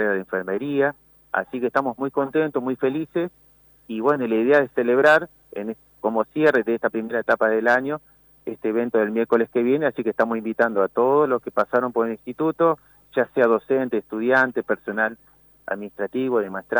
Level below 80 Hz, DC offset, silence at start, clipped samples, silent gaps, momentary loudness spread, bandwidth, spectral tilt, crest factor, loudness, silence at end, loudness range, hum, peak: -66 dBFS; under 0.1%; 0 s; under 0.1%; none; 11 LU; over 20 kHz; -7 dB/octave; 16 dB; -22 LUFS; 0 s; 3 LU; none; -6 dBFS